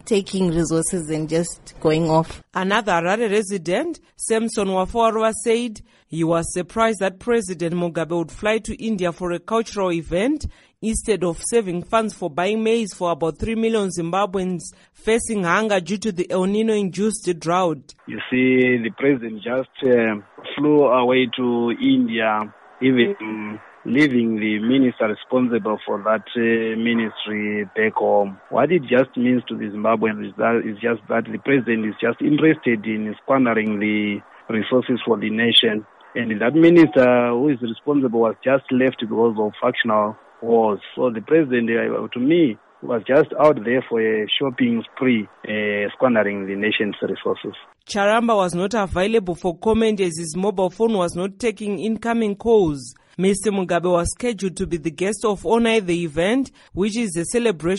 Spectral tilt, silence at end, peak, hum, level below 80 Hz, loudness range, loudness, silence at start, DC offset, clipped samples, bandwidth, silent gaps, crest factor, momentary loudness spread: -5 dB/octave; 0 s; -4 dBFS; none; -46 dBFS; 4 LU; -20 LUFS; 0.05 s; under 0.1%; under 0.1%; 11.5 kHz; none; 16 dB; 8 LU